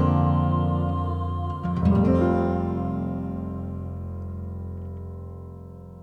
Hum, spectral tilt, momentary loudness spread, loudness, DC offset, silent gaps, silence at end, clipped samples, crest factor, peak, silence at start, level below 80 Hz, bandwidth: none; -10.5 dB/octave; 17 LU; -25 LUFS; under 0.1%; none; 0 s; under 0.1%; 16 dB; -8 dBFS; 0 s; -40 dBFS; 4.7 kHz